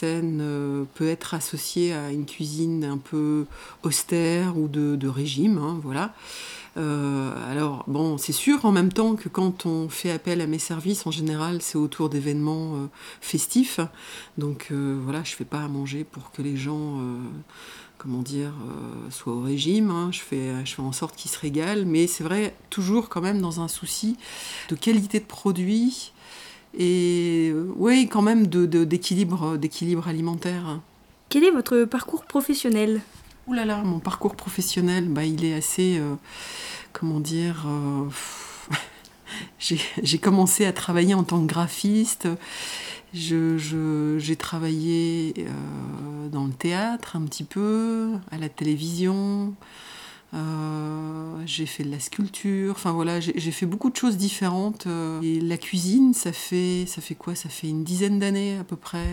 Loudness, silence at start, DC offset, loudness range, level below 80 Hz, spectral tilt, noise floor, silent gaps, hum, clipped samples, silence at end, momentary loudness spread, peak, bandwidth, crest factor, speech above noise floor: -25 LUFS; 0 s; under 0.1%; 7 LU; -56 dBFS; -5 dB/octave; -45 dBFS; none; none; under 0.1%; 0 s; 13 LU; -6 dBFS; 19.5 kHz; 18 dB; 20 dB